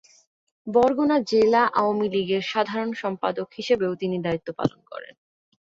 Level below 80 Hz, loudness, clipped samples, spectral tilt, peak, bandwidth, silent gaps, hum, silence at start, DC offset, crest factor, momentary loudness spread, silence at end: -60 dBFS; -23 LUFS; under 0.1%; -6 dB/octave; -6 dBFS; 7.8 kHz; none; none; 0.65 s; under 0.1%; 18 dB; 10 LU; 0.75 s